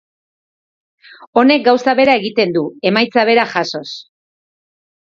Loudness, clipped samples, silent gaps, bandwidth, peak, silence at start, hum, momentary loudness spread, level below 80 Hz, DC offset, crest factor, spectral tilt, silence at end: -13 LUFS; under 0.1%; 1.27-1.33 s; 7.4 kHz; 0 dBFS; 1.2 s; none; 11 LU; -62 dBFS; under 0.1%; 16 dB; -5 dB/octave; 1.05 s